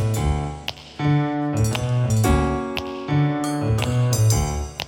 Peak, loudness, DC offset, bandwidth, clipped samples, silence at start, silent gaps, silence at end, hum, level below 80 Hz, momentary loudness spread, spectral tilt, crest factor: -6 dBFS; -22 LUFS; under 0.1%; 18 kHz; under 0.1%; 0 s; none; 0 s; none; -32 dBFS; 8 LU; -6 dB/octave; 16 dB